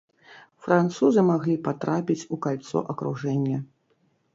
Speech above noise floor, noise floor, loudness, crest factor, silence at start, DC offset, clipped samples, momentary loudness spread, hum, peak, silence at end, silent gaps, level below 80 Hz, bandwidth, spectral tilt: 44 dB; -68 dBFS; -25 LUFS; 20 dB; 0.3 s; under 0.1%; under 0.1%; 10 LU; none; -6 dBFS; 0.7 s; none; -68 dBFS; 7.8 kHz; -7.5 dB/octave